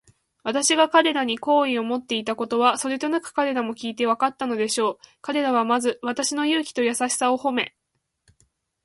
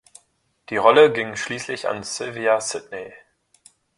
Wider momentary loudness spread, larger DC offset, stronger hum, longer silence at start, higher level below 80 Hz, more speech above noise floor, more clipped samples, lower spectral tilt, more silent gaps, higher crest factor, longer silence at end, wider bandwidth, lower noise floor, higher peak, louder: second, 8 LU vs 19 LU; neither; neither; second, 0.45 s vs 0.7 s; second, -70 dBFS vs -64 dBFS; first, 49 dB vs 45 dB; neither; about the same, -2 dB/octave vs -3 dB/octave; neither; about the same, 20 dB vs 22 dB; first, 1.15 s vs 0.8 s; about the same, 12 kHz vs 11.5 kHz; first, -72 dBFS vs -65 dBFS; second, -4 dBFS vs 0 dBFS; second, -23 LUFS vs -20 LUFS